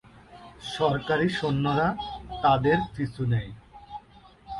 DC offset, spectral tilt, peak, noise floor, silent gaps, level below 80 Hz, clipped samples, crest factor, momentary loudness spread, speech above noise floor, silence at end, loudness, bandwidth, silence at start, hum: under 0.1%; -7 dB/octave; -10 dBFS; -53 dBFS; none; -50 dBFS; under 0.1%; 18 dB; 21 LU; 28 dB; 0 s; -26 LUFS; 11.5 kHz; 0.3 s; none